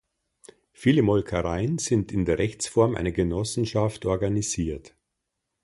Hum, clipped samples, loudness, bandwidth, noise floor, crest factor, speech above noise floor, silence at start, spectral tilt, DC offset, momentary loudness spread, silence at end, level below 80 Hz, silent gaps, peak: none; under 0.1%; -25 LUFS; 11.5 kHz; -81 dBFS; 20 dB; 57 dB; 0.8 s; -5.5 dB/octave; under 0.1%; 6 LU; 0.75 s; -44 dBFS; none; -6 dBFS